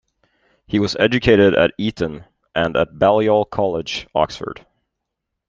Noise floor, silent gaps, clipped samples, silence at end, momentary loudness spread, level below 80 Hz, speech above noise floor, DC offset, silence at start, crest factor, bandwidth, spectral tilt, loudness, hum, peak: -79 dBFS; none; under 0.1%; 0.95 s; 13 LU; -46 dBFS; 62 dB; under 0.1%; 0.7 s; 18 dB; 7.6 kHz; -6 dB/octave; -18 LUFS; none; -2 dBFS